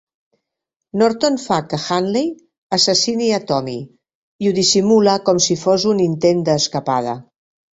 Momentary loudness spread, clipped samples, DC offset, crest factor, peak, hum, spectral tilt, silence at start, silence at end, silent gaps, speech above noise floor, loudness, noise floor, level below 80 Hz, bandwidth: 8 LU; under 0.1%; under 0.1%; 16 dB; -2 dBFS; none; -4 dB/octave; 0.95 s; 0.5 s; 2.58-2.70 s, 4.15-4.39 s; 65 dB; -17 LUFS; -81 dBFS; -58 dBFS; 8.2 kHz